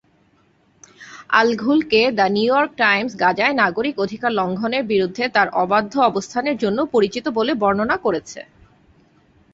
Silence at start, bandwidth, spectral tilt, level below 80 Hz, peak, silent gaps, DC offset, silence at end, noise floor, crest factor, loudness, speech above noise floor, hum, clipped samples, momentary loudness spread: 1 s; 8 kHz; -5 dB/octave; -58 dBFS; -2 dBFS; none; under 0.1%; 1.1 s; -58 dBFS; 18 dB; -18 LUFS; 40 dB; none; under 0.1%; 6 LU